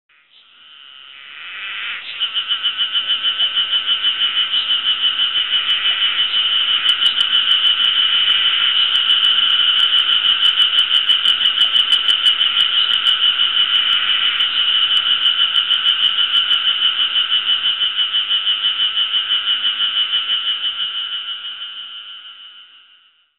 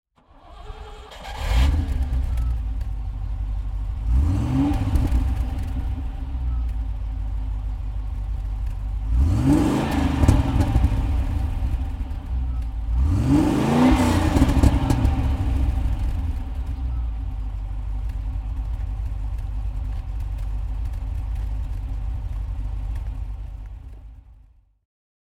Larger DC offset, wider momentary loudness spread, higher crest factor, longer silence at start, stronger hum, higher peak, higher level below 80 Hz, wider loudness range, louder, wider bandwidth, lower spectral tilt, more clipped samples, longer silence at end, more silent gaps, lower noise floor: first, 0.4% vs under 0.1%; about the same, 10 LU vs 12 LU; second, 12 dB vs 22 dB; first, 0.7 s vs 0.45 s; neither; about the same, -4 dBFS vs -2 dBFS; second, -64 dBFS vs -24 dBFS; second, 6 LU vs 10 LU; first, -13 LUFS vs -25 LUFS; second, 11.5 kHz vs 14 kHz; second, 1 dB/octave vs -7.5 dB/octave; neither; second, 0.75 s vs 0.95 s; neither; about the same, -53 dBFS vs -53 dBFS